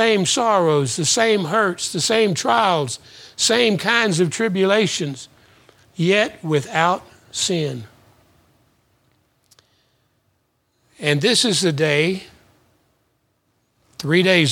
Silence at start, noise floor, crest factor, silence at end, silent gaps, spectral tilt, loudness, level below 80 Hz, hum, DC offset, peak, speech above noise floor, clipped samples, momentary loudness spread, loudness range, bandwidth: 0 s; -67 dBFS; 20 dB; 0 s; none; -3.5 dB/octave; -18 LUFS; -64 dBFS; none; under 0.1%; 0 dBFS; 49 dB; under 0.1%; 12 LU; 8 LU; 17.5 kHz